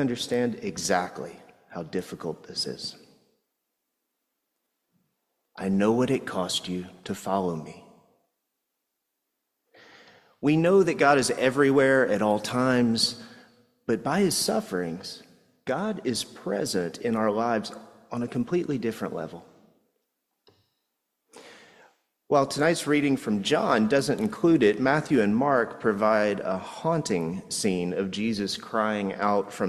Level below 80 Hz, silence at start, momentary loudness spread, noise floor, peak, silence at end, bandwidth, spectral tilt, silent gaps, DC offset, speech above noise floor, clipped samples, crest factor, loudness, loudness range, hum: -62 dBFS; 0 s; 15 LU; -81 dBFS; -6 dBFS; 0 s; 14.5 kHz; -4.5 dB/octave; none; under 0.1%; 56 dB; under 0.1%; 20 dB; -25 LUFS; 13 LU; none